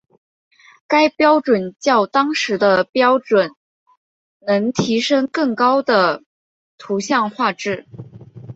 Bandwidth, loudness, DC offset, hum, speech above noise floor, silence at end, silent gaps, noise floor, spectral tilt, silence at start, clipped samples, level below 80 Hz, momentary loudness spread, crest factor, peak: 8 kHz; -17 LUFS; under 0.1%; none; over 73 dB; 0.05 s; 2.89-2.93 s, 3.57-3.86 s, 3.97-4.40 s, 6.26-6.78 s; under -90 dBFS; -4.5 dB/octave; 0.9 s; under 0.1%; -62 dBFS; 11 LU; 16 dB; -2 dBFS